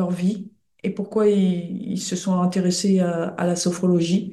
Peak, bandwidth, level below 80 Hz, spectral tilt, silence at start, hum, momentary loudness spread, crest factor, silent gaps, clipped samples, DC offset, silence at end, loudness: -8 dBFS; 12.5 kHz; -66 dBFS; -6 dB/octave; 0 s; none; 9 LU; 14 dB; none; under 0.1%; under 0.1%; 0 s; -22 LUFS